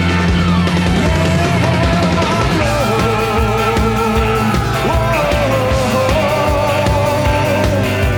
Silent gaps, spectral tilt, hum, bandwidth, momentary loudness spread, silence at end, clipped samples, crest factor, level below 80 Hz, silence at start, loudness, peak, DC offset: none; -6 dB/octave; none; 19.5 kHz; 1 LU; 0 s; under 0.1%; 12 dB; -24 dBFS; 0 s; -14 LUFS; 0 dBFS; under 0.1%